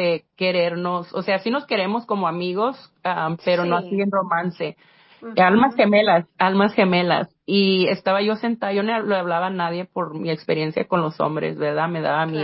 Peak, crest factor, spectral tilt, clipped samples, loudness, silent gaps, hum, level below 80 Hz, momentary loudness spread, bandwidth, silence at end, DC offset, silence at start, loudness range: -4 dBFS; 18 dB; -10.5 dB/octave; under 0.1%; -21 LUFS; none; none; -66 dBFS; 9 LU; 5.8 kHz; 0 s; under 0.1%; 0 s; 5 LU